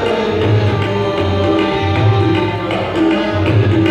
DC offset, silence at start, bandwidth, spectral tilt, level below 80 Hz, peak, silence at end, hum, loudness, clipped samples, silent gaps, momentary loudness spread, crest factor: under 0.1%; 0 s; 8.4 kHz; -7.5 dB/octave; -38 dBFS; -2 dBFS; 0 s; none; -14 LUFS; under 0.1%; none; 3 LU; 12 dB